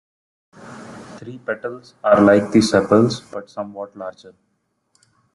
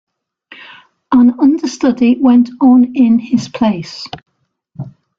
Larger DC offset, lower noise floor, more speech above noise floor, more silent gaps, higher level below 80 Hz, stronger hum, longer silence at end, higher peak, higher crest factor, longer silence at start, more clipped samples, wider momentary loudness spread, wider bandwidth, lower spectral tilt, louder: neither; first, -70 dBFS vs -50 dBFS; first, 52 dB vs 40 dB; neither; about the same, -58 dBFS vs -54 dBFS; neither; first, 1.05 s vs 0.3 s; about the same, -2 dBFS vs -2 dBFS; first, 18 dB vs 12 dB; second, 0.65 s vs 1.1 s; neither; first, 24 LU vs 20 LU; first, 11.5 kHz vs 7.6 kHz; about the same, -6 dB/octave vs -6 dB/octave; second, -17 LUFS vs -11 LUFS